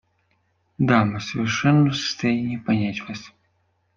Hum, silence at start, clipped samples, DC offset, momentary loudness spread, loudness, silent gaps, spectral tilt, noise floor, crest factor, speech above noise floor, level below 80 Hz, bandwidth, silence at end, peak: none; 0.8 s; under 0.1%; under 0.1%; 11 LU; -22 LUFS; none; -6 dB/octave; -68 dBFS; 20 dB; 47 dB; -58 dBFS; 7.4 kHz; 0.7 s; -2 dBFS